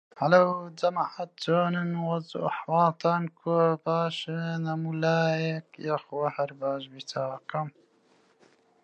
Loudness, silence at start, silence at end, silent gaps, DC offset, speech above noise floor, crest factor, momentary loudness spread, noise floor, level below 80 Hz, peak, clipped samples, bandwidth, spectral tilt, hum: -28 LUFS; 0.15 s; 1.15 s; none; under 0.1%; 37 dB; 20 dB; 10 LU; -64 dBFS; -80 dBFS; -8 dBFS; under 0.1%; 8.6 kHz; -7 dB/octave; none